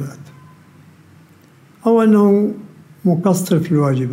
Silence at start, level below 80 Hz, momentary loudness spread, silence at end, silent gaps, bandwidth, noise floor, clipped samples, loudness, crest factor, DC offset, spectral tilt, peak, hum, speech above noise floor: 0 s; -66 dBFS; 11 LU; 0 s; none; 16 kHz; -47 dBFS; under 0.1%; -15 LUFS; 14 dB; under 0.1%; -7.5 dB/octave; -2 dBFS; none; 33 dB